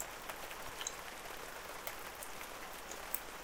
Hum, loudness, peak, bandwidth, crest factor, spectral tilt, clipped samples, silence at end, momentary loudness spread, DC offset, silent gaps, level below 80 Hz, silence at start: none; -45 LUFS; -14 dBFS; 18 kHz; 32 dB; -1 dB/octave; under 0.1%; 0 s; 5 LU; under 0.1%; none; -62 dBFS; 0 s